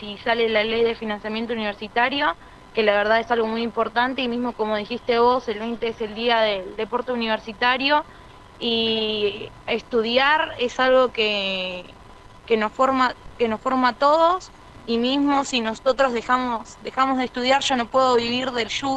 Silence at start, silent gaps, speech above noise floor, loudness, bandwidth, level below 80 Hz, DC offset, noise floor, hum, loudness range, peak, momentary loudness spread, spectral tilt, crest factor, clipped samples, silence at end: 0 s; none; 23 dB; -21 LUFS; 9.4 kHz; -52 dBFS; under 0.1%; -45 dBFS; none; 2 LU; -4 dBFS; 9 LU; -3.5 dB/octave; 18 dB; under 0.1%; 0 s